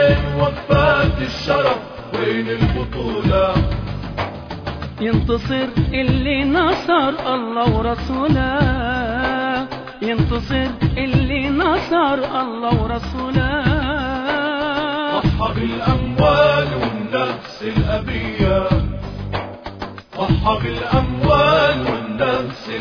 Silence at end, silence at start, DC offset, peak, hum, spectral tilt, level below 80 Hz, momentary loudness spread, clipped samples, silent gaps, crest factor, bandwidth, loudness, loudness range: 0 s; 0 s; under 0.1%; -2 dBFS; none; -7.5 dB/octave; -28 dBFS; 10 LU; under 0.1%; none; 16 dB; 5.4 kHz; -19 LUFS; 3 LU